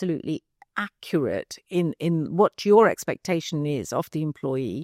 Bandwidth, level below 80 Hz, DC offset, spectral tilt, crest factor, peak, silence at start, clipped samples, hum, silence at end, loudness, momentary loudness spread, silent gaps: 16 kHz; -66 dBFS; under 0.1%; -6 dB/octave; 18 dB; -6 dBFS; 0 s; under 0.1%; none; 0 s; -25 LUFS; 14 LU; none